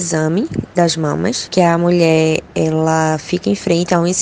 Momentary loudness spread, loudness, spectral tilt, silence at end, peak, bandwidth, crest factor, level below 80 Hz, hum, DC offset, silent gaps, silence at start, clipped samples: 6 LU; -15 LUFS; -5 dB/octave; 0 s; 0 dBFS; 9.8 kHz; 14 dB; -46 dBFS; none; under 0.1%; none; 0 s; under 0.1%